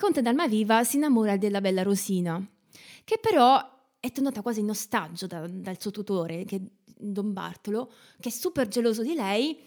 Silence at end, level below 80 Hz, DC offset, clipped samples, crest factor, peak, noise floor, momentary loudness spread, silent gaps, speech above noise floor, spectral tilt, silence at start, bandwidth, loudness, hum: 0.1 s; -70 dBFS; under 0.1%; under 0.1%; 18 dB; -8 dBFS; -52 dBFS; 14 LU; none; 26 dB; -5 dB/octave; 0 s; over 20 kHz; -27 LUFS; none